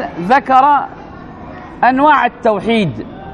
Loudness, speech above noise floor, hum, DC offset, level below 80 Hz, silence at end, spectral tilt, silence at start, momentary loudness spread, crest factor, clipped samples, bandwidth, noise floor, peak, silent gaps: -12 LUFS; 20 dB; none; under 0.1%; -44 dBFS; 0 s; -6.5 dB/octave; 0 s; 22 LU; 14 dB; under 0.1%; 10 kHz; -32 dBFS; 0 dBFS; none